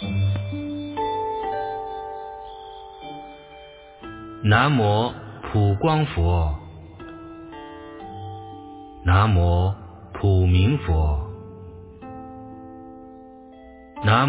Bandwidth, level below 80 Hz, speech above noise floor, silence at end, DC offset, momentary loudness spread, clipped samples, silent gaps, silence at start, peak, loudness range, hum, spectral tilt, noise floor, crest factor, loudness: 4 kHz; -32 dBFS; 26 dB; 0 s; under 0.1%; 23 LU; under 0.1%; none; 0 s; -4 dBFS; 9 LU; none; -11 dB/octave; -45 dBFS; 20 dB; -22 LUFS